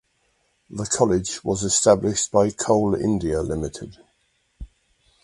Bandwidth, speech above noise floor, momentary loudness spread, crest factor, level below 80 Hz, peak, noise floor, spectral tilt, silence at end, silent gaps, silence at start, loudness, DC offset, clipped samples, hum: 11.5 kHz; 46 dB; 14 LU; 22 dB; -44 dBFS; -2 dBFS; -67 dBFS; -4.5 dB/octave; 0.6 s; none; 0.7 s; -21 LUFS; under 0.1%; under 0.1%; none